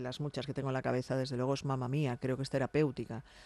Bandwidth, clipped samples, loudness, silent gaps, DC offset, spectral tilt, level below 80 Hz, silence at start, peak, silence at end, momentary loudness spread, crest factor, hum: 12 kHz; under 0.1%; -35 LUFS; none; under 0.1%; -7 dB/octave; -62 dBFS; 0 s; -20 dBFS; 0 s; 6 LU; 16 dB; none